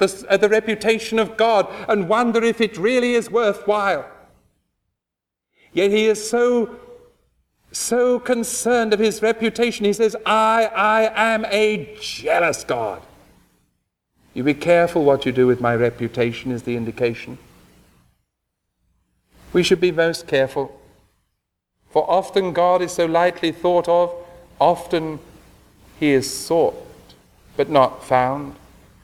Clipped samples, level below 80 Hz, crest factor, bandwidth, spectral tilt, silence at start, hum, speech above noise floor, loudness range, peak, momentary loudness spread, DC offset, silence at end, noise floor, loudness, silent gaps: under 0.1%; -54 dBFS; 18 dB; 15.5 kHz; -4.5 dB/octave; 0 s; none; 66 dB; 5 LU; -2 dBFS; 9 LU; under 0.1%; 0.5 s; -84 dBFS; -19 LUFS; none